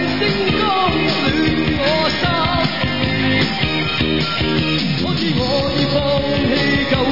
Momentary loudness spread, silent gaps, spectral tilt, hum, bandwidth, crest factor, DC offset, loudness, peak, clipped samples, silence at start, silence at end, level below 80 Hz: 2 LU; none; -6 dB/octave; none; 5.8 kHz; 14 dB; 2%; -16 LUFS; -2 dBFS; under 0.1%; 0 s; 0 s; -36 dBFS